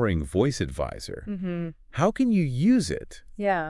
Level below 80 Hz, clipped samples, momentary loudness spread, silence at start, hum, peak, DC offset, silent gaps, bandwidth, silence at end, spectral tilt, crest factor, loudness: -44 dBFS; under 0.1%; 12 LU; 0 s; none; -8 dBFS; under 0.1%; none; 12 kHz; 0 s; -6.5 dB/octave; 18 dB; -26 LUFS